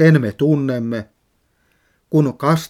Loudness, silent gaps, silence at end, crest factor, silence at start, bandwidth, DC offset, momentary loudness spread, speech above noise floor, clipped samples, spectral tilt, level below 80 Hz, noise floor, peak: -18 LUFS; none; 0.05 s; 18 dB; 0 s; 14.5 kHz; under 0.1%; 11 LU; 48 dB; under 0.1%; -7.5 dB/octave; -58 dBFS; -64 dBFS; 0 dBFS